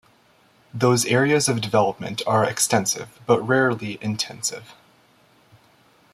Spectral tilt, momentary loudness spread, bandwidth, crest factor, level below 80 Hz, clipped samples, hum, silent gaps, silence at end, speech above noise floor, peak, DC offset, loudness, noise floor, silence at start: -4 dB/octave; 10 LU; 15.5 kHz; 20 dB; -62 dBFS; under 0.1%; none; none; 1.4 s; 36 dB; -4 dBFS; under 0.1%; -21 LUFS; -58 dBFS; 0.75 s